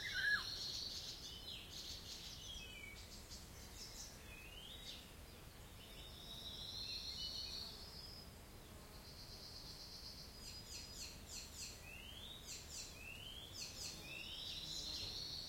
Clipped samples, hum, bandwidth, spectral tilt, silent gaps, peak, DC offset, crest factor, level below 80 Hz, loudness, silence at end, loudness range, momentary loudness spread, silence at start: under 0.1%; none; 16.5 kHz; -1.5 dB/octave; none; -28 dBFS; under 0.1%; 22 dB; -62 dBFS; -49 LUFS; 0 s; 5 LU; 11 LU; 0 s